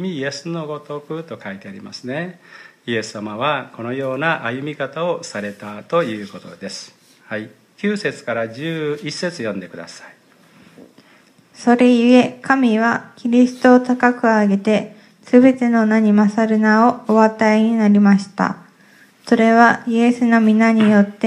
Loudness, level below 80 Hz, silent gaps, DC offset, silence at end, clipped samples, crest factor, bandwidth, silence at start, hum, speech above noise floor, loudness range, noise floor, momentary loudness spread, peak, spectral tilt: -16 LUFS; -70 dBFS; none; under 0.1%; 0 s; under 0.1%; 18 dB; 10.5 kHz; 0 s; none; 35 dB; 11 LU; -51 dBFS; 18 LU; 0 dBFS; -6.5 dB/octave